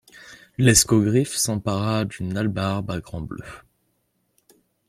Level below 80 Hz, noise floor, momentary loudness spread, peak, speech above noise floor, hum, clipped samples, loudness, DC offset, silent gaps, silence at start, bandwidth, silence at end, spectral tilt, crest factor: -46 dBFS; -70 dBFS; 19 LU; -2 dBFS; 49 dB; none; under 0.1%; -21 LUFS; under 0.1%; none; 0.15 s; 16.5 kHz; 1.3 s; -4.5 dB/octave; 20 dB